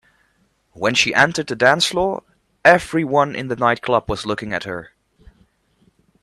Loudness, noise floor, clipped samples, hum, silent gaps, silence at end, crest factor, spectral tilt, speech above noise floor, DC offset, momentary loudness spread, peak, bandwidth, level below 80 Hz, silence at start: -18 LUFS; -63 dBFS; under 0.1%; none; none; 1.4 s; 20 dB; -3.5 dB/octave; 45 dB; under 0.1%; 11 LU; 0 dBFS; 13.5 kHz; -48 dBFS; 0.75 s